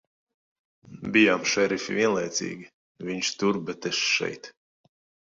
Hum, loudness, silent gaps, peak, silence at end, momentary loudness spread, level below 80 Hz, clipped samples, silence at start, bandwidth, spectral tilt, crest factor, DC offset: none; -25 LUFS; 2.74-2.95 s; -6 dBFS; 0.8 s; 17 LU; -68 dBFS; under 0.1%; 0.9 s; 7.8 kHz; -3 dB/octave; 22 dB; under 0.1%